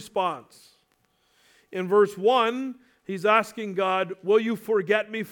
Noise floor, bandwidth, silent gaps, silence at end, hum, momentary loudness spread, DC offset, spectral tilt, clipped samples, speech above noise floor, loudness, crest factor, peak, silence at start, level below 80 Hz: -68 dBFS; 17.5 kHz; none; 0 s; none; 15 LU; under 0.1%; -5 dB/octave; under 0.1%; 44 dB; -24 LUFS; 20 dB; -6 dBFS; 0 s; -76 dBFS